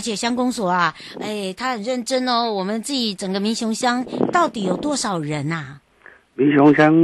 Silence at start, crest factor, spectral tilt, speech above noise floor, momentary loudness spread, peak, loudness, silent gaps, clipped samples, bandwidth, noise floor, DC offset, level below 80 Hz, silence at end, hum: 0 s; 16 dB; -4.5 dB/octave; 30 dB; 12 LU; -4 dBFS; -20 LUFS; none; under 0.1%; 12.5 kHz; -49 dBFS; under 0.1%; -60 dBFS; 0 s; none